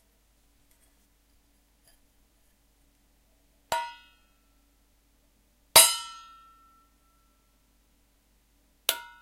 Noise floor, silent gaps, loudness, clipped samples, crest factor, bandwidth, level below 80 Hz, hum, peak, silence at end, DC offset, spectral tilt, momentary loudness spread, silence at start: -66 dBFS; none; -22 LUFS; under 0.1%; 30 dB; 16 kHz; -64 dBFS; none; -4 dBFS; 0.2 s; under 0.1%; 1.5 dB/octave; 25 LU; 3.7 s